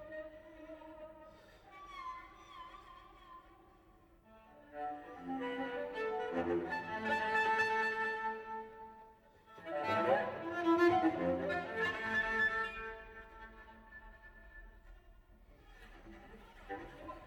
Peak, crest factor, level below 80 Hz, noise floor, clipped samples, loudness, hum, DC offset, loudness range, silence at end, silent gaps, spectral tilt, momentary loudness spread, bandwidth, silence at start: -20 dBFS; 20 dB; -64 dBFS; -64 dBFS; under 0.1%; -36 LUFS; none; under 0.1%; 19 LU; 0 s; none; -5.5 dB/octave; 25 LU; 19 kHz; 0 s